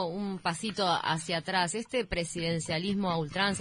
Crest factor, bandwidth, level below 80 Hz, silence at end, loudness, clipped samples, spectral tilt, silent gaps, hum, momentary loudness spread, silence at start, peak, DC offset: 18 dB; 11 kHz; -54 dBFS; 0 s; -31 LUFS; under 0.1%; -4 dB/octave; none; none; 4 LU; 0 s; -14 dBFS; under 0.1%